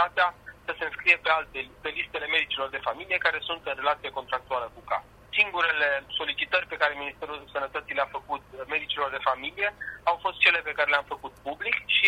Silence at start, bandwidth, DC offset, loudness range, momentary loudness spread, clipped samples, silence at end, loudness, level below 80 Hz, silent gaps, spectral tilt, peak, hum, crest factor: 0 s; 16 kHz; under 0.1%; 3 LU; 13 LU; under 0.1%; 0 s; -27 LUFS; -60 dBFS; none; -3 dB/octave; -4 dBFS; none; 24 dB